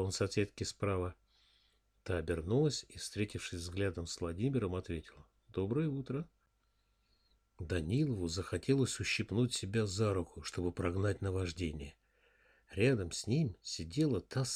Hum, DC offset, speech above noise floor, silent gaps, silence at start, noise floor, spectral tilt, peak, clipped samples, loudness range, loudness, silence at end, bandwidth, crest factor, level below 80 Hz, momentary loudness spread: none; under 0.1%; 41 dB; none; 0 s; -76 dBFS; -5.5 dB/octave; -18 dBFS; under 0.1%; 4 LU; -37 LUFS; 0 s; 14.5 kHz; 20 dB; -56 dBFS; 10 LU